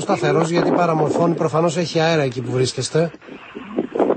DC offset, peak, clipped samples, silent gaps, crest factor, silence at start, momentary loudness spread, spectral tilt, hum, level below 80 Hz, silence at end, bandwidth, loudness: under 0.1%; -4 dBFS; under 0.1%; none; 16 dB; 0 s; 10 LU; -5.5 dB/octave; none; -58 dBFS; 0 s; 8.8 kHz; -19 LUFS